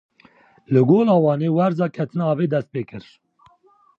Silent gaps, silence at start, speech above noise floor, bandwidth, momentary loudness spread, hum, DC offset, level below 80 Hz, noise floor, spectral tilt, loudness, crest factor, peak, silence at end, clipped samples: none; 0.7 s; 38 dB; 6.8 kHz; 15 LU; none; under 0.1%; -66 dBFS; -57 dBFS; -10 dB/octave; -19 LUFS; 16 dB; -4 dBFS; 1 s; under 0.1%